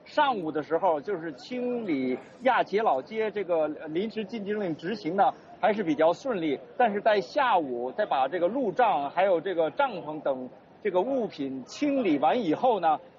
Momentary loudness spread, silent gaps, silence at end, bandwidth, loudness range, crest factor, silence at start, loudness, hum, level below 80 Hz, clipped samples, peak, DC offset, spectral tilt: 8 LU; none; 0.1 s; 7.4 kHz; 3 LU; 14 dB; 0.05 s; -27 LUFS; none; -74 dBFS; under 0.1%; -12 dBFS; under 0.1%; -3.5 dB/octave